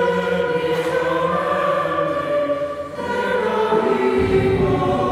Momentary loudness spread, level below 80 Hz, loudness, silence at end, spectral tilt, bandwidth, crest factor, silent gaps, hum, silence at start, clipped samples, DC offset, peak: 5 LU; -42 dBFS; -19 LUFS; 0 s; -6.5 dB/octave; 14 kHz; 14 dB; none; none; 0 s; under 0.1%; under 0.1%; -6 dBFS